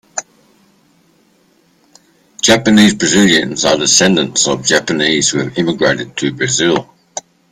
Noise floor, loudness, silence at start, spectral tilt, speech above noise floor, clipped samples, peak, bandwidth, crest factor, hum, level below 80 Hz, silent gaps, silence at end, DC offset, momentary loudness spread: -54 dBFS; -12 LUFS; 0.15 s; -3 dB/octave; 41 dB; under 0.1%; 0 dBFS; 16 kHz; 14 dB; none; -48 dBFS; none; 0.3 s; under 0.1%; 15 LU